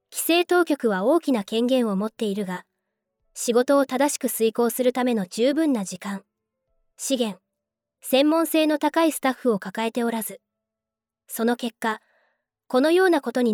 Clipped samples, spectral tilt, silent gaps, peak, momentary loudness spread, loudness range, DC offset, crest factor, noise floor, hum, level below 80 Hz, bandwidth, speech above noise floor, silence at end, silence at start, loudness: under 0.1%; -4 dB/octave; none; -8 dBFS; 12 LU; 4 LU; under 0.1%; 16 dB; -88 dBFS; none; -76 dBFS; over 20 kHz; 66 dB; 0 s; 0.1 s; -23 LUFS